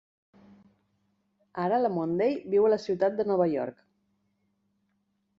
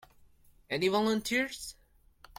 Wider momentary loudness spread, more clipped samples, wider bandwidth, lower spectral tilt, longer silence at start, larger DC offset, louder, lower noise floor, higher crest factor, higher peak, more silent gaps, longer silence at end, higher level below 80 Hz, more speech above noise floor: second, 9 LU vs 13 LU; neither; second, 7.4 kHz vs 16.5 kHz; first, -8 dB/octave vs -4 dB/octave; first, 1.55 s vs 0.7 s; neither; first, -27 LUFS vs -31 LUFS; first, -75 dBFS vs -61 dBFS; about the same, 18 dB vs 18 dB; first, -12 dBFS vs -16 dBFS; neither; first, 1.65 s vs 0.65 s; second, -72 dBFS vs -62 dBFS; first, 49 dB vs 30 dB